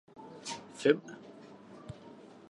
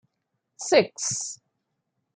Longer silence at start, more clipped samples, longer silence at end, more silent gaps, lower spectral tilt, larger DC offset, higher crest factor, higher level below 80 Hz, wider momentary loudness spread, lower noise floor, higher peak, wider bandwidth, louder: second, 0.15 s vs 0.6 s; neither; second, 0.15 s vs 0.8 s; neither; first, -4.5 dB/octave vs -2.5 dB/octave; neither; about the same, 28 dB vs 24 dB; about the same, -72 dBFS vs -74 dBFS; first, 23 LU vs 15 LU; second, -53 dBFS vs -79 dBFS; second, -10 dBFS vs -4 dBFS; first, 11 kHz vs 9.6 kHz; second, -33 LUFS vs -24 LUFS